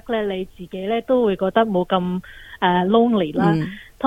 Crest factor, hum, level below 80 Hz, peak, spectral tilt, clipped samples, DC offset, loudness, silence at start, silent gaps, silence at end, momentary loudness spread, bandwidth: 16 dB; none; -50 dBFS; -4 dBFS; -8 dB/octave; under 0.1%; under 0.1%; -20 LUFS; 0.05 s; none; 0 s; 13 LU; 10.5 kHz